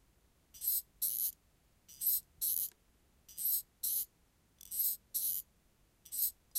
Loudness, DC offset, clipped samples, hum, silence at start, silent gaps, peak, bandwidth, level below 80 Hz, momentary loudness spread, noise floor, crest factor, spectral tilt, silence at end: -35 LUFS; under 0.1%; under 0.1%; none; 0.55 s; none; -18 dBFS; 16 kHz; -72 dBFS; 8 LU; -71 dBFS; 22 dB; 1.5 dB/octave; 0 s